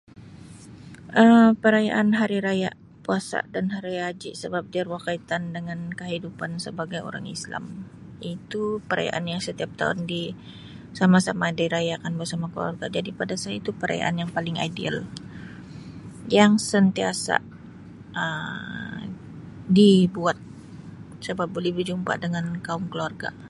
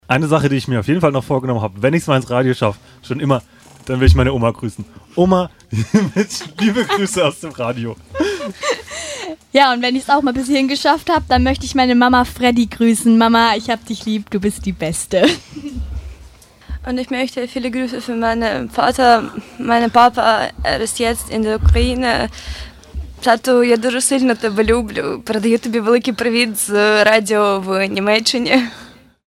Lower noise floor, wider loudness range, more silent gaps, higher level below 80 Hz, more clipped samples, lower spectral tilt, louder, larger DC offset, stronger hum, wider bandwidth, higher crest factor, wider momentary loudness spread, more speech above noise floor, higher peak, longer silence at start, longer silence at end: about the same, -44 dBFS vs -42 dBFS; first, 9 LU vs 5 LU; neither; second, -58 dBFS vs -30 dBFS; neither; about the same, -5.5 dB/octave vs -5 dB/octave; second, -24 LUFS vs -16 LUFS; neither; neither; second, 11.5 kHz vs 16 kHz; first, 22 dB vs 16 dB; first, 22 LU vs 13 LU; second, 21 dB vs 27 dB; about the same, -2 dBFS vs 0 dBFS; about the same, 0.15 s vs 0.1 s; second, 0 s vs 0.45 s